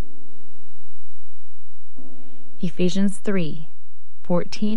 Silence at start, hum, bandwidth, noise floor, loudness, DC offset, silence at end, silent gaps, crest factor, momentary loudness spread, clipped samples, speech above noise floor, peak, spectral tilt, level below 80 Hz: 0 s; none; 11.5 kHz; -50 dBFS; -25 LUFS; 20%; 0 s; none; 16 dB; 26 LU; under 0.1%; 27 dB; -6 dBFS; -6.5 dB/octave; -60 dBFS